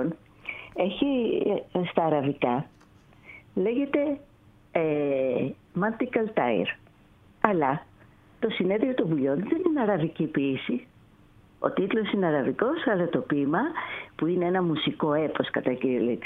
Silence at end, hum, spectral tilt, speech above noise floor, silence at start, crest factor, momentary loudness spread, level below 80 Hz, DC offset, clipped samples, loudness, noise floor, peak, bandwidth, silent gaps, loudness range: 0 s; none; -9 dB/octave; 30 dB; 0 s; 26 dB; 7 LU; -62 dBFS; under 0.1%; under 0.1%; -27 LUFS; -56 dBFS; 0 dBFS; 4.1 kHz; none; 2 LU